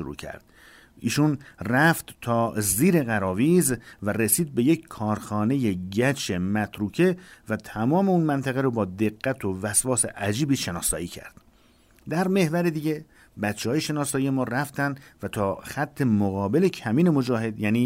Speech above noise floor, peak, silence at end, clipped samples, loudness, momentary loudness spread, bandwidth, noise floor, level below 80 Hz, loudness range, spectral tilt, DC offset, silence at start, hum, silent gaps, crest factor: 33 dB; -6 dBFS; 0 s; under 0.1%; -24 LUFS; 10 LU; 16 kHz; -58 dBFS; -54 dBFS; 4 LU; -5 dB/octave; under 0.1%; 0 s; none; none; 18 dB